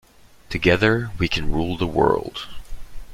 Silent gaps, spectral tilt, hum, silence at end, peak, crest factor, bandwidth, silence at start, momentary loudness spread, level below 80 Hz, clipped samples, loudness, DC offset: none; -6 dB/octave; none; 0 s; -2 dBFS; 20 dB; 15 kHz; 0.5 s; 15 LU; -34 dBFS; under 0.1%; -21 LUFS; under 0.1%